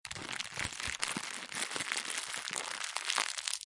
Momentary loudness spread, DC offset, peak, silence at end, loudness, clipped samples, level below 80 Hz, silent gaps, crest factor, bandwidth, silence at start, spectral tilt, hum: 6 LU; under 0.1%; -8 dBFS; 0 s; -36 LUFS; under 0.1%; -66 dBFS; none; 30 dB; 11.5 kHz; 0.05 s; 0 dB/octave; none